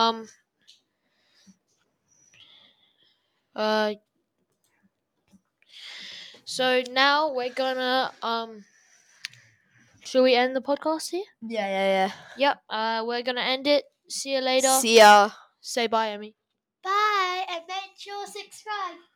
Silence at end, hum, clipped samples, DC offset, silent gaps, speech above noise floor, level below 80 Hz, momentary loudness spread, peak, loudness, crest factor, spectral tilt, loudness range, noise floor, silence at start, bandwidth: 0.2 s; none; under 0.1%; under 0.1%; none; 51 dB; -84 dBFS; 20 LU; -4 dBFS; -23 LUFS; 22 dB; -2 dB/octave; 13 LU; -75 dBFS; 0 s; over 20 kHz